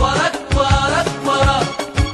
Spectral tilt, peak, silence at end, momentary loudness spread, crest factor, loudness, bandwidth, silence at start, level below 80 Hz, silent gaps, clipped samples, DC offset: -4.5 dB/octave; -2 dBFS; 0 s; 5 LU; 14 dB; -16 LUFS; 12.5 kHz; 0 s; -24 dBFS; none; under 0.1%; under 0.1%